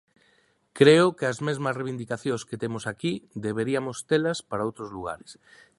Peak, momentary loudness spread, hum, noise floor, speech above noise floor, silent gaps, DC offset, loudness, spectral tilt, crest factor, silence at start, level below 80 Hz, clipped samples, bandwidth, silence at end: -2 dBFS; 15 LU; none; -65 dBFS; 40 dB; none; under 0.1%; -26 LUFS; -5.5 dB/octave; 24 dB; 0.75 s; -62 dBFS; under 0.1%; 11.5 kHz; 0.45 s